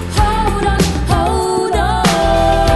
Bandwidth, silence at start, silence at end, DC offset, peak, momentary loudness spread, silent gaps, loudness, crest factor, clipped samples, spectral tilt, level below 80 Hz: 12.5 kHz; 0 s; 0 s; under 0.1%; 0 dBFS; 3 LU; none; -14 LUFS; 12 dB; under 0.1%; -5 dB/octave; -20 dBFS